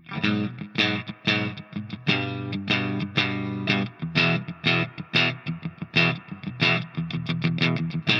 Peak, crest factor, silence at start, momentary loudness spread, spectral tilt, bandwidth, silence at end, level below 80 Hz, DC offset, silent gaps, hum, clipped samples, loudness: -6 dBFS; 20 dB; 0.05 s; 9 LU; -6 dB/octave; 7.2 kHz; 0 s; -64 dBFS; under 0.1%; none; none; under 0.1%; -25 LUFS